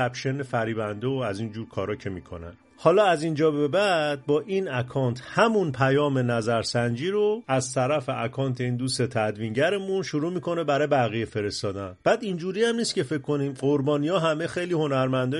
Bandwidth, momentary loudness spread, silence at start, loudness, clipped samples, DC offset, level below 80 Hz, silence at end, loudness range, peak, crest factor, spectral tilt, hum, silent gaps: 11.5 kHz; 8 LU; 0 s; -25 LUFS; under 0.1%; under 0.1%; -60 dBFS; 0 s; 2 LU; -6 dBFS; 20 dB; -5.5 dB/octave; none; none